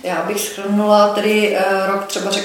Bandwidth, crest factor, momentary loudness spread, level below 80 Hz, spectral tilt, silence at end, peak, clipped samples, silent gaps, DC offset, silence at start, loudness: 17.5 kHz; 16 dB; 8 LU; -64 dBFS; -4 dB/octave; 0 s; 0 dBFS; under 0.1%; none; under 0.1%; 0.05 s; -16 LUFS